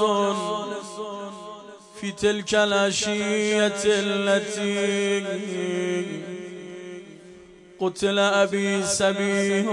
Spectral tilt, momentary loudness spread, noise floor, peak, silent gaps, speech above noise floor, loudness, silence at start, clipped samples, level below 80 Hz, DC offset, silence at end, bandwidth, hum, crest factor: -3.5 dB/octave; 17 LU; -47 dBFS; -10 dBFS; none; 24 dB; -23 LUFS; 0 s; under 0.1%; -62 dBFS; under 0.1%; 0 s; 11.5 kHz; none; 16 dB